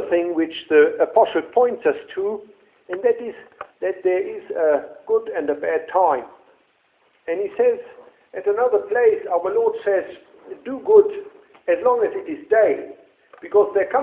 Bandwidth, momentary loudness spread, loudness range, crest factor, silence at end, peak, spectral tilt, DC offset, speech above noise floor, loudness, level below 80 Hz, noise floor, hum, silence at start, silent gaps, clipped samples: 3.9 kHz; 16 LU; 4 LU; 20 dB; 0 s; -2 dBFS; -8.5 dB/octave; under 0.1%; 42 dB; -20 LUFS; -66 dBFS; -62 dBFS; none; 0 s; none; under 0.1%